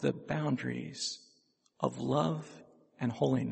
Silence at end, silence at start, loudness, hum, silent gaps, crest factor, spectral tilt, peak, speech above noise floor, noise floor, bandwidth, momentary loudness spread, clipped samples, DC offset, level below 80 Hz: 0 s; 0 s; -34 LUFS; none; none; 22 dB; -6 dB/octave; -12 dBFS; 38 dB; -71 dBFS; 8.4 kHz; 8 LU; under 0.1%; under 0.1%; -70 dBFS